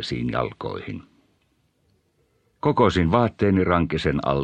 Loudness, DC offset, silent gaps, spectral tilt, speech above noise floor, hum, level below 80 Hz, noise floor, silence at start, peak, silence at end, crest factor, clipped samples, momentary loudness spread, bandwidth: -22 LUFS; under 0.1%; none; -7.5 dB/octave; 45 dB; none; -42 dBFS; -67 dBFS; 0 s; -4 dBFS; 0 s; 20 dB; under 0.1%; 14 LU; 9.2 kHz